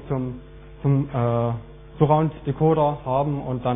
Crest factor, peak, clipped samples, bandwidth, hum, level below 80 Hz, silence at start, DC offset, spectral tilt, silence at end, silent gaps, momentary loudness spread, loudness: 18 dB; -4 dBFS; under 0.1%; 3.8 kHz; none; -44 dBFS; 0 s; under 0.1%; -12.5 dB/octave; 0 s; none; 9 LU; -23 LUFS